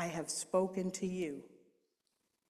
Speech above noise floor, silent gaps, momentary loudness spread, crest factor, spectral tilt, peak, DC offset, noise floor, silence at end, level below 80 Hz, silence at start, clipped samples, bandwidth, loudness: 46 dB; none; 8 LU; 20 dB; -4.5 dB/octave; -20 dBFS; under 0.1%; -83 dBFS; 0.95 s; -74 dBFS; 0 s; under 0.1%; 14.5 kHz; -37 LUFS